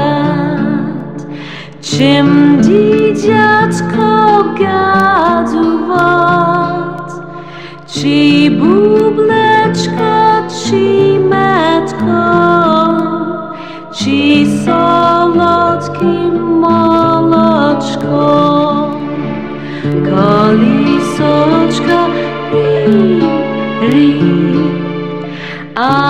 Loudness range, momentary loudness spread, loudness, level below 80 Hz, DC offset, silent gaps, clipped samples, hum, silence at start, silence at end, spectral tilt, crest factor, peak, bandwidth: 2 LU; 12 LU; -10 LUFS; -48 dBFS; 1%; none; under 0.1%; none; 0 s; 0 s; -6.5 dB/octave; 10 dB; 0 dBFS; 10.5 kHz